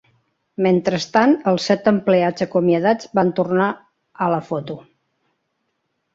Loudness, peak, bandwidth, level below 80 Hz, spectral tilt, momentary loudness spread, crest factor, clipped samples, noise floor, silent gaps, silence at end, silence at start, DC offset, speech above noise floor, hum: -18 LUFS; -2 dBFS; 7.8 kHz; -62 dBFS; -6.5 dB/octave; 11 LU; 18 dB; under 0.1%; -72 dBFS; none; 1.35 s; 0.6 s; under 0.1%; 55 dB; none